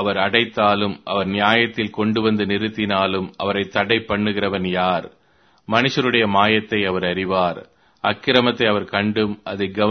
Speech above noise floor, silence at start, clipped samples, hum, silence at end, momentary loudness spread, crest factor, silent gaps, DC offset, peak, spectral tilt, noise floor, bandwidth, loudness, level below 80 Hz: 30 dB; 0 s; under 0.1%; none; 0 s; 7 LU; 20 dB; none; under 0.1%; 0 dBFS; -6 dB/octave; -49 dBFS; 6.6 kHz; -19 LUFS; -54 dBFS